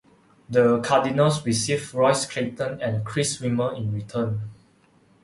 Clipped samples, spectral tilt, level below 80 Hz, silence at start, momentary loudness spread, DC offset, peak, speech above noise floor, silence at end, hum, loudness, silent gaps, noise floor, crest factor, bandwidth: under 0.1%; -5 dB/octave; -58 dBFS; 0.5 s; 9 LU; under 0.1%; -6 dBFS; 36 dB; 0.7 s; none; -23 LUFS; none; -59 dBFS; 18 dB; 11.5 kHz